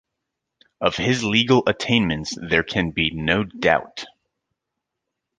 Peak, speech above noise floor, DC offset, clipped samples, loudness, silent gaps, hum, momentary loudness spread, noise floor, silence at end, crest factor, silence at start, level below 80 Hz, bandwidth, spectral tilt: -2 dBFS; 61 dB; under 0.1%; under 0.1%; -20 LUFS; none; none; 8 LU; -82 dBFS; 1.3 s; 22 dB; 0.8 s; -46 dBFS; 9.6 kHz; -5 dB/octave